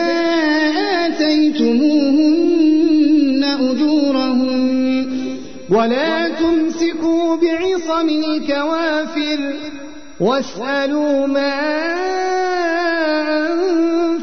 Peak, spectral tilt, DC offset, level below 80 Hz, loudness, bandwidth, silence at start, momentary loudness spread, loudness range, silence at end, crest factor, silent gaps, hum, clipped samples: -6 dBFS; -4.5 dB/octave; 2%; -52 dBFS; -16 LUFS; 6.6 kHz; 0 s; 6 LU; 5 LU; 0 s; 10 dB; none; none; under 0.1%